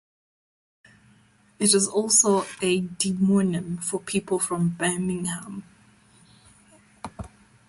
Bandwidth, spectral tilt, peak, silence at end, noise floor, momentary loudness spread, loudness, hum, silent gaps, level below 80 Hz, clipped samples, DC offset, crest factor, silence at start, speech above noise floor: 12 kHz; -4 dB/octave; -6 dBFS; 0.4 s; -59 dBFS; 21 LU; -23 LUFS; none; none; -58 dBFS; under 0.1%; under 0.1%; 22 dB; 1.6 s; 35 dB